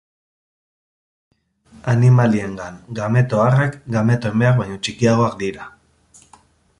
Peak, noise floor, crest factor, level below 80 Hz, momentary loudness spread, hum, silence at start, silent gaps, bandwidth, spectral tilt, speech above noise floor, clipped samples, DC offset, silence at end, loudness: -2 dBFS; -52 dBFS; 16 dB; -50 dBFS; 16 LU; none; 1.85 s; none; 10.5 kHz; -7 dB/octave; 35 dB; under 0.1%; under 0.1%; 1.1 s; -18 LUFS